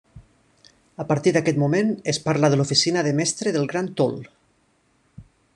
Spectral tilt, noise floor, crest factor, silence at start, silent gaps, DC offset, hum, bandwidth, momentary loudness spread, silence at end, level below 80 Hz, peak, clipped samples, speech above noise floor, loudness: -4.5 dB/octave; -64 dBFS; 20 dB; 0.15 s; none; under 0.1%; none; 11 kHz; 7 LU; 0.35 s; -60 dBFS; -4 dBFS; under 0.1%; 43 dB; -21 LUFS